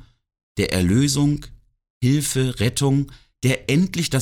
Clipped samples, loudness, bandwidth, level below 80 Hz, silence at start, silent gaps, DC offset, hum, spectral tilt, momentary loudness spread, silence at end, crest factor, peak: under 0.1%; -21 LUFS; 17.5 kHz; -42 dBFS; 0.55 s; 1.90-2.01 s; under 0.1%; none; -5 dB/octave; 7 LU; 0 s; 14 dB; -6 dBFS